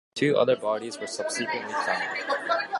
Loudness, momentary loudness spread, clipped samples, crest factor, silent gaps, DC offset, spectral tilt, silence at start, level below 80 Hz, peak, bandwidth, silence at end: -27 LUFS; 8 LU; under 0.1%; 16 dB; none; under 0.1%; -3.5 dB/octave; 0.15 s; -76 dBFS; -10 dBFS; 11.5 kHz; 0 s